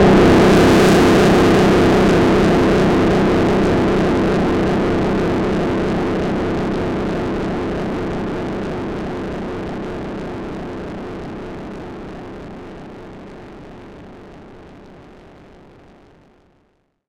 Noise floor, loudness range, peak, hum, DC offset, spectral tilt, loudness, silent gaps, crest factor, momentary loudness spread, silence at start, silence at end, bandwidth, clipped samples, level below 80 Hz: -62 dBFS; 22 LU; -4 dBFS; none; under 0.1%; -6.5 dB/octave; -16 LUFS; none; 14 dB; 23 LU; 0 s; 2.1 s; 16.5 kHz; under 0.1%; -32 dBFS